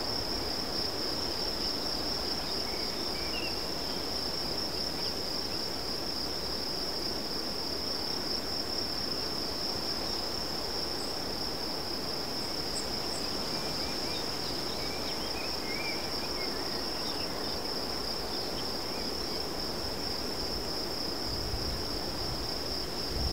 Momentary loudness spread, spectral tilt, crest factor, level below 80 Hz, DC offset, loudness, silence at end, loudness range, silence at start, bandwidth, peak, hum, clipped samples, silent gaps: 2 LU; -3 dB/octave; 14 dB; -48 dBFS; 0.9%; -32 LUFS; 0 s; 2 LU; 0 s; 16 kHz; -20 dBFS; none; under 0.1%; none